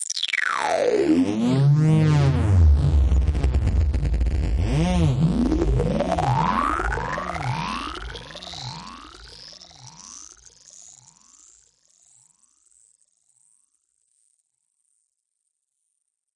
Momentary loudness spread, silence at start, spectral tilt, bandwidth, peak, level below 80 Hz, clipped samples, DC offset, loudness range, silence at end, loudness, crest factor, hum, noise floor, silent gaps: 23 LU; 0 s; -6.5 dB/octave; 11 kHz; -6 dBFS; -28 dBFS; under 0.1%; under 0.1%; 20 LU; 6.1 s; -21 LUFS; 16 dB; none; -78 dBFS; none